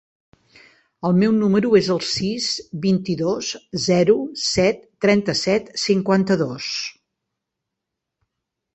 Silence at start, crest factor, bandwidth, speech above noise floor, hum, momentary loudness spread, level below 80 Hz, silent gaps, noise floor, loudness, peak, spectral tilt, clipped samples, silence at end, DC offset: 1.05 s; 18 dB; 8.4 kHz; 63 dB; none; 8 LU; -54 dBFS; none; -82 dBFS; -20 LUFS; -2 dBFS; -5 dB/octave; under 0.1%; 1.85 s; under 0.1%